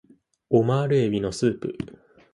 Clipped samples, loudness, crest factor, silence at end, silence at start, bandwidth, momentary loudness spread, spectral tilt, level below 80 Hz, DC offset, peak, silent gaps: under 0.1%; -23 LUFS; 18 dB; 0.45 s; 0.5 s; 11.5 kHz; 13 LU; -7 dB/octave; -54 dBFS; under 0.1%; -8 dBFS; none